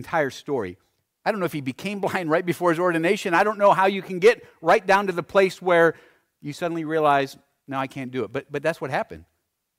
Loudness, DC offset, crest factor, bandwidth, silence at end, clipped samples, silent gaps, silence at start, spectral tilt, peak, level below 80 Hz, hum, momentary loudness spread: -22 LUFS; under 0.1%; 16 dB; 16 kHz; 0.55 s; under 0.1%; none; 0 s; -5.5 dB/octave; -6 dBFS; -64 dBFS; none; 11 LU